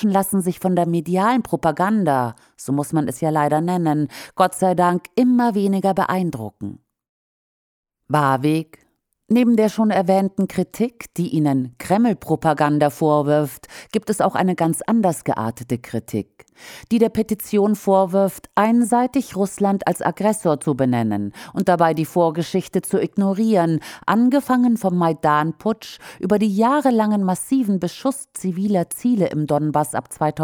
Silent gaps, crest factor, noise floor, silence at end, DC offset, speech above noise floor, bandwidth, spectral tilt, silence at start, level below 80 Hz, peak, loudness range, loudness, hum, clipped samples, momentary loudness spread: 7.09-7.83 s; 18 dB; under -90 dBFS; 0 s; under 0.1%; over 71 dB; 19.5 kHz; -6.5 dB/octave; 0 s; -58 dBFS; -2 dBFS; 3 LU; -19 LUFS; none; under 0.1%; 9 LU